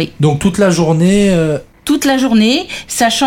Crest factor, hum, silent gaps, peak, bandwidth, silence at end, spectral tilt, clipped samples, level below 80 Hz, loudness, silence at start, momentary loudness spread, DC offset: 12 dB; none; none; 0 dBFS; 17 kHz; 0 s; -5 dB/octave; under 0.1%; -38 dBFS; -12 LUFS; 0 s; 7 LU; under 0.1%